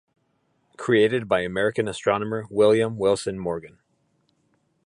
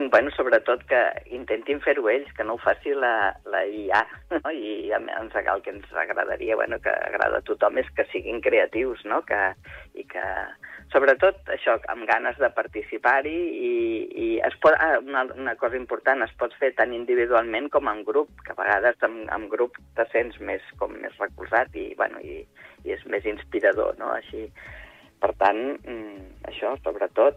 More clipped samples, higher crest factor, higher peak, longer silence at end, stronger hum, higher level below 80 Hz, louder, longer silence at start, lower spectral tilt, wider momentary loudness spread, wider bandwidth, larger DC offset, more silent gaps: neither; about the same, 18 dB vs 18 dB; about the same, -6 dBFS vs -8 dBFS; first, 1.2 s vs 0 s; neither; second, -58 dBFS vs -52 dBFS; about the same, -23 LUFS vs -24 LUFS; first, 0.8 s vs 0 s; about the same, -5.5 dB/octave vs -6 dB/octave; about the same, 11 LU vs 12 LU; first, 11.5 kHz vs 7 kHz; neither; neither